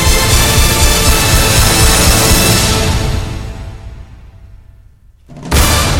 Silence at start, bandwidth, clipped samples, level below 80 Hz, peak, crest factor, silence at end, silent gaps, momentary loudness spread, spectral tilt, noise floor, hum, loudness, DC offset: 0 s; 18 kHz; under 0.1%; -16 dBFS; 0 dBFS; 12 dB; 0 s; none; 17 LU; -3 dB/octave; -42 dBFS; none; -9 LUFS; under 0.1%